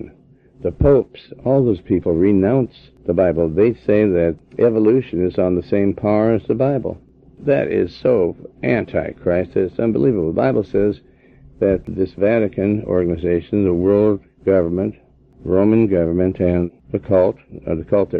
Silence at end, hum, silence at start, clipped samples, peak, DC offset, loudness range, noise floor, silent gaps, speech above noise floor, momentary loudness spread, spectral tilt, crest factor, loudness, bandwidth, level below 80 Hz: 0 s; none; 0 s; under 0.1%; -2 dBFS; under 0.1%; 3 LU; -49 dBFS; none; 32 dB; 10 LU; -11 dB/octave; 14 dB; -18 LUFS; 5 kHz; -40 dBFS